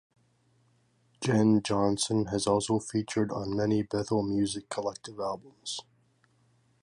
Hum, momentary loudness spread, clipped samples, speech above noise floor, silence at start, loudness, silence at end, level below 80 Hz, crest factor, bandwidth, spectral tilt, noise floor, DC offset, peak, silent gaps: none; 11 LU; under 0.1%; 39 dB; 1.2 s; -29 LUFS; 1 s; -60 dBFS; 18 dB; 11.5 kHz; -5.5 dB/octave; -68 dBFS; under 0.1%; -12 dBFS; none